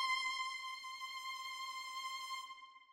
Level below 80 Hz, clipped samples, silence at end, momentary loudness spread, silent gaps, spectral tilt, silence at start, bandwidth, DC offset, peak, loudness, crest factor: -86 dBFS; under 0.1%; 0 s; 9 LU; none; 4 dB/octave; 0 s; 16 kHz; under 0.1%; -28 dBFS; -43 LUFS; 16 dB